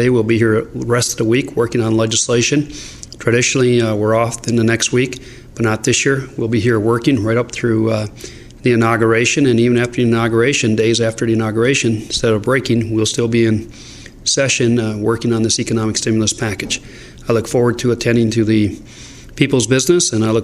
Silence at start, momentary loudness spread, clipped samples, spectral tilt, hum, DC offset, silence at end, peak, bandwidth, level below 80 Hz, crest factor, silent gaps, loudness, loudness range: 0 s; 9 LU; under 0.1%; -4.5 dB/octave; none; under 0.1%; 0 s; 0 dBFS; 14 kHz; -42 dBFS; 14 dB; none; -15 LUFS; 2 LU